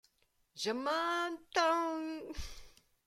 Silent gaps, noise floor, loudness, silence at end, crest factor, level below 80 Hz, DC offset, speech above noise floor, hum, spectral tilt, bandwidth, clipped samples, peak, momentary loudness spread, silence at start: none; -75 dBFS; -35 LUFS; 0.35 s; 20 dB; -56 dBFS; under 0.1%; 40 dB; none; -3 dB/octave; 15.5 kHz; under 0.1%; -16 dBFS; 16 LU; 0.55 s